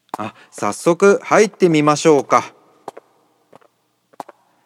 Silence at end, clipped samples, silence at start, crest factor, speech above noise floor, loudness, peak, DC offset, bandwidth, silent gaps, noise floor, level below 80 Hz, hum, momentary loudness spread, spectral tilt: 2.15 s; under 0.1%; 0.2 s; 18 dB; 46 dB; -15 LUFS; 0 dBFS; under 0.1%; 13.5 kHz; none; -60 dBFS; -70 dBFS; none; 16 LU; -5 dB/octave